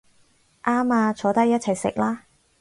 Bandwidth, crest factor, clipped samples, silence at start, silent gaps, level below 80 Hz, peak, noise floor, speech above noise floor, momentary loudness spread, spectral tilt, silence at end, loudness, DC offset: 11.5 kHz; 18 dB; under 0.1%; 0.65 s; none; -60 dBFS; -6 dBFS; -60 dBFS; 39 dB; 7 LU; -5.5 dB/octave; 0.4 s; -22 LUFS; under 0.1%